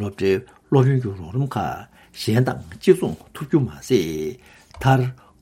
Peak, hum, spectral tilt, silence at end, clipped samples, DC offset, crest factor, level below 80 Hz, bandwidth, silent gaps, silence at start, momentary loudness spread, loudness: -2 dBFS; none; -7 dB/octave; 0.25 s; under 0.1%; under 0.1%; 20 dB; -50 dBFS; 15.5 kHz; none; 0 s; 11 LU; -22 LUFS